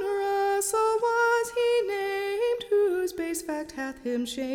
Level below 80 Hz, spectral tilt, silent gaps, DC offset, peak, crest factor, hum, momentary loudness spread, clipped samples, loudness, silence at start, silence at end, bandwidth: -62 dBFS; -2 dB/octave; none; under 0.1%; -14 dBFS; 12 dB; none; 8 LU; under 0.1%; -27 LUFS; 0 s; 0 s; 18 kHz